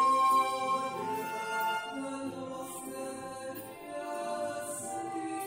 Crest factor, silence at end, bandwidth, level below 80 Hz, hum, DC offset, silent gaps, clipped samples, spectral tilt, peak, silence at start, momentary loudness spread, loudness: 16 dB; 0 s; 16 kHz; -74 dBFS; none; under 0.1%; none; under 0.1%; -3 dB/octave; -18 dBFS; 0 s; 14 LU; -34 LUFS